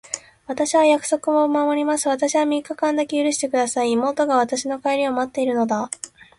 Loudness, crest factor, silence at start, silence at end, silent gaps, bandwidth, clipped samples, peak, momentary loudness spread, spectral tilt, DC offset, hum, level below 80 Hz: -20 LUFS; 16 dB; 0.1 s; 0.3 s; none; 11.5 kHz; under 0.1%; -6 dBFS; 7 LU; -3 dB/octave; under 0.1%; none; -64 dBFS